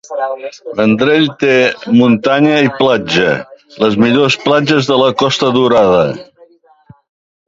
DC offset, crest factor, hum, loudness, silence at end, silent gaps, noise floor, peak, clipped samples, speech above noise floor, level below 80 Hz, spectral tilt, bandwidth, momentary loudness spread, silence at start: under 0.1%; 12 dB; none; -11 LUFS; 1.25 s; none; -46 dBFS; 0 dBFS; under 0.1%; 34 dB; -50 dBFS; -5.5 dB/octave; 7.8 kHz; 10 LU; 0.1 s